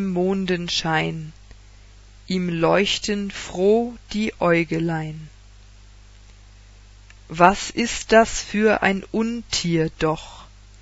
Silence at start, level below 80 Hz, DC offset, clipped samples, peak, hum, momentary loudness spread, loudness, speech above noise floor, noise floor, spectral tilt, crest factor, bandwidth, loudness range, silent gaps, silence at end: 0 s; -44 dBFS; under 0.1%; under 0.1%; 0 dBFS; 50 Hz at -45 dBFS; 12 LU; -21 LUFS; 25 dB; -46 dBFS; -4.5 dB/octave; 22 dB; 8 kHz; 5 LU; none; 0.35 s